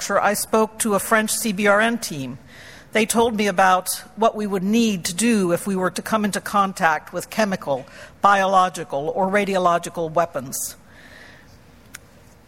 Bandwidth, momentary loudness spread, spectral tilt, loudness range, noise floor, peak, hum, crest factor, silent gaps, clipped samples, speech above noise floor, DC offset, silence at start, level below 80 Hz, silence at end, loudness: 16.5 kHz; 10 LU; -4 dB/octave; 2 LU; -49 dBFS; -2 dBFS; none; 20 dB; none; under 0.1%; 29 dB; under 0.1%; 0 s; -56 dBFS; 1.15 s; -20 LUFS